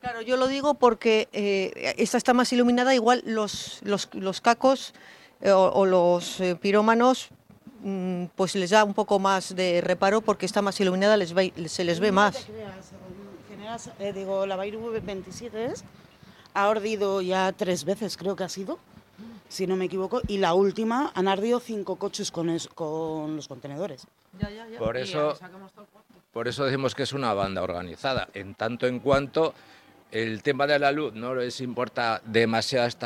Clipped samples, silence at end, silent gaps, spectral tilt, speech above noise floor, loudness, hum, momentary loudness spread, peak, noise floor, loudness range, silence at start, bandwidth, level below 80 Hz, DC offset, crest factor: under 0.1%; 0 s; none; -4.5 dB/octave; 27 dB; -25 LUFS; none; 15 LU; -4 dBFS; -52 dBFS; 9 LU; 0.05 s; 15.5 kHz; -56 dBFS; under 0.1%; 20 dB